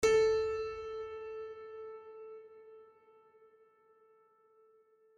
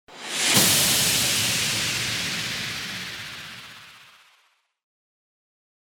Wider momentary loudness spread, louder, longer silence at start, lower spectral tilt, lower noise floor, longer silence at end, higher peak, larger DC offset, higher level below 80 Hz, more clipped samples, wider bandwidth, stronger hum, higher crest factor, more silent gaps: first, 26 LU vs 19 LU; second, -36 LUFS vs -21 LUFS; about the same, 0 s vs 0.1 s; first, -3 dB/octave vs -1 dB/octave; about the same, -67 dBFS vs -65 dBFS; first, 2.35 s vs 1.85 s; second, -18 dBFS vs -4 dBFS; neither; second, -64 dBFS vs -56 dBFS; neither; second, 12 kHz vs over 20 kHz; neither; about the same, 20 dB vs 22 dB; neither